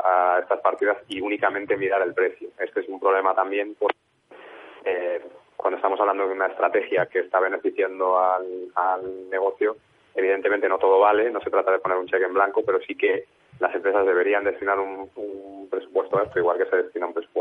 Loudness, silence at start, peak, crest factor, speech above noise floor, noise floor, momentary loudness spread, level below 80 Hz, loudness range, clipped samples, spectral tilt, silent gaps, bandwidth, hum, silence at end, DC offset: -23 LUFS; 0 s; -6 dBFS; 16 dB; 26 dB; -49 dBFS; 10 LU; -68 dBFS; 4 LU; under 0.1%; -6.5 dB/octave; none; 10 kHz; none; 0 s; under 0.1%